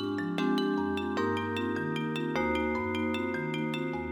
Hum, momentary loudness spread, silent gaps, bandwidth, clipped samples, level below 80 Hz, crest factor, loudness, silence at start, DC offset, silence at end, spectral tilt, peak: none; 3 LU; none; 16.5 kHz; under 0.1%; -56 dBFS; 16 dB; -31 LUFS; 0 s; under 0.1%; 0 s; -6.5 dB/octave; -16 dBFS